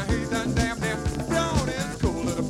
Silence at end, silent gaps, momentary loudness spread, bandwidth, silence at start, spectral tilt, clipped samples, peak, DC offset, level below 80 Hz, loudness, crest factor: 0 s; none; 3 LU; 16 kHz; 0 s; -5 dB/octave; under 0.1%; -8 dBFS; under 0.1%; -34 dBFS; -26 LUFS; 16 dB